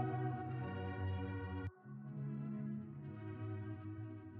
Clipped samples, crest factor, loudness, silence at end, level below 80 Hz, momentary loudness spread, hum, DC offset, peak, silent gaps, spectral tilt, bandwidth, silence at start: under 0.1%; 16 dB; -45 LUFS; 0 s; -66 dBFS; 7 LU; none; under 0.1%; -28 dBFS; none; -8 dB/octave; 4.1 kHz; 0 s